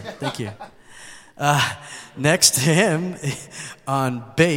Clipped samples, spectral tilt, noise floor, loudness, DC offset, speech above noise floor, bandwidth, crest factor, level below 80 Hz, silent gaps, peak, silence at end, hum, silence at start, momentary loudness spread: under 0.1%; -3.5 dB/octave; -43 dBFS; -20 LUFS; under 0.1%; 22 dB; 16.5 kHz; 22 dB; -56 dBFS; none; 0 dBFS; 0 s; none; 0 s; 22 LU